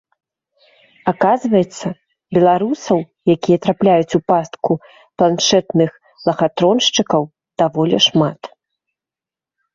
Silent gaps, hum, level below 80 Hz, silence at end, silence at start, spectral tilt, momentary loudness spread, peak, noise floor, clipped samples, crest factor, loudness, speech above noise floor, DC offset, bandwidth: none; none; -56 dBFS; 1.25 s; 1.05 s; -5 dB/octave; 9 LU; -2 dBFS; -89 dBFS; under 0.1%; 16 dB; -16 LUFS; 74 dB; under 0.1%; 7.8 kHz